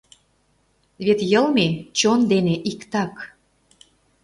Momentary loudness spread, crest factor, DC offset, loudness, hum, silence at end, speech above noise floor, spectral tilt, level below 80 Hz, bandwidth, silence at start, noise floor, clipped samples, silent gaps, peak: 11 LU; 18 dB; under 0.1%; -20 LUFS; none; 0.95 s; 44 dB; -5 dB/octave; -60 dBFS; 11.5 kHz; 1 s; -64 dBFS; under 0.1%; none; -4 dBFS